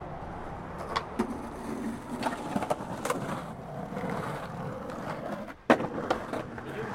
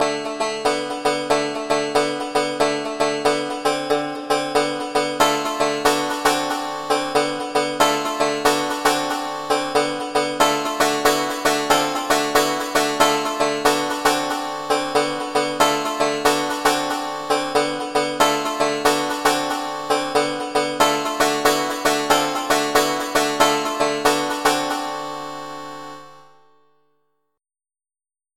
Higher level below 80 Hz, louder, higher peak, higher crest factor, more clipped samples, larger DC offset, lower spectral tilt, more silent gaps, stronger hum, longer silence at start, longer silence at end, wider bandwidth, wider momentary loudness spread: about the same, -54 dBFS vs -52 dBFS; second, -34 LUFS vs -20 LUFS; second, -8 dBFS vs -2 dBFS; first, 26 dB vs 18 dB; neither; neither; first, -5.5 dB/octave vs -2.5 dB/octave; neither; neither; about the same, 0 s vs 0 s; second, 0 s vs 2.1 s; about the same, 16.5 kHz vs 16.5 kHz; first, 11 LU vs 5 LU